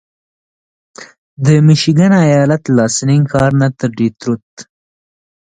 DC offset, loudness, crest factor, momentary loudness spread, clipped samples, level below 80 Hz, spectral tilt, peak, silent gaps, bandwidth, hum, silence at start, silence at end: under 0.1%; -12 LUFS; 14 dB; 8 LU; under 0.1%; -46 dBFS; -6 dB/octave; 0 dBFS; 1.18-1.37 s, 4.43-4.57 s; 9.4 kHz; none; 1 s; 0.9 s